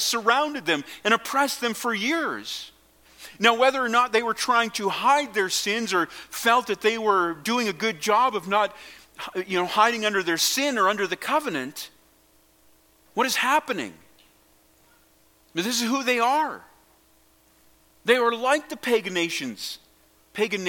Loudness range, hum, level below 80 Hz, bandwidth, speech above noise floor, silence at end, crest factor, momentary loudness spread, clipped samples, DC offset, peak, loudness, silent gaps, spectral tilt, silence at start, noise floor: 5 LU; none; -68 dBFS; 17.5 kHz; 36 dB; 0 s; 22 dB; 13 LU; under 0.1%; under 0.1%; -2 dBFS; -23 LUFS; none; -2 dB/octave; 0 s; -60 dBFS